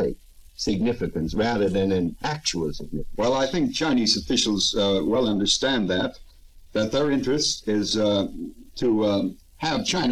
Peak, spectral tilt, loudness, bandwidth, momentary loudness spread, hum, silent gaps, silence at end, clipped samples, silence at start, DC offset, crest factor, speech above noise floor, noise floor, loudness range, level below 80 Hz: -8 dBFS; -4 dB/octave; -23 LUFS; 14.5 kHz; 9 LU; none; none; 0 s; under 0.1%; 0 s; 0.2%; 16 dB; 25 dB; -48 dBFS; 3 LU; -44 dBFS